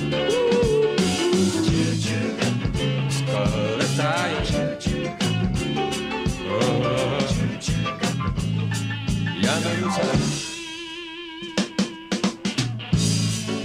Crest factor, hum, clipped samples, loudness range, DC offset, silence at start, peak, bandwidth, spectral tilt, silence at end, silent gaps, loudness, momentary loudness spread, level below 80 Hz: 16 dB; none; under 0.1%; 4 LU; under 0.1%; 0 s; -8 dBFS; 16 kHz; -5 dB/octave; 0 s; none; -23 LUFS; 6 LU; -38 dBFS